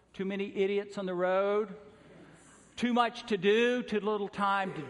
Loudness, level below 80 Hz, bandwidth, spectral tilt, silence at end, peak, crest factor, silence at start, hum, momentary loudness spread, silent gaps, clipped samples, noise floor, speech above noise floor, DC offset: -31 LUFS; -70 dBFS; 11 kHz; -5.5 dB/octave; 0 s; -14 dBFS; 18 dB; 0.15 s; none; 9 LU; none; under 0.1%; -57 dBFS; 27 dB; under 0.1%